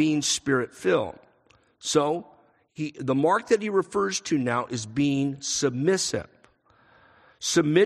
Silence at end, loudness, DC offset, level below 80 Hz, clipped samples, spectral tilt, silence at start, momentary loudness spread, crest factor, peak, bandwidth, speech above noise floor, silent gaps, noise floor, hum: 0 s; -25 LUFS; under 0.1%; -62 dBFS; under 0.1%; -4 dB/octave; 0 s; 9 LU; 18 dB; -8 dBFS; 13 kHz; 38 dB; none; -62 dBFS; none